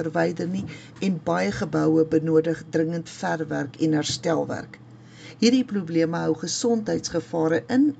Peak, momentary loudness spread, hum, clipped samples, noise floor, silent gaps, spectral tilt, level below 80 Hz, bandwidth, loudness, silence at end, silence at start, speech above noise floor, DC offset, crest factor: -6 dBFS; 9 LU; none; under 0.1%; -44 dBFS; none; -5.5 dB/octave; -58 dBFS; 9.2 kHz; -24 LUFS; 0.05 s; 0 s; 21 dB; under 0.1%; 18 dB